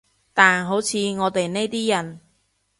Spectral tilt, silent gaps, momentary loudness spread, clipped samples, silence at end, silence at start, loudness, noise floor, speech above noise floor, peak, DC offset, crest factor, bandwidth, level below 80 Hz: -3.5 dB/octave; none; 9 LU; under 0.1%; 0.6 s; 0.35 s; -20 LUFS; -67 dBFS; 47 dB; 0 dBFS; under 0.1%; 22 dB; 11.5 kHz; -64 dBFS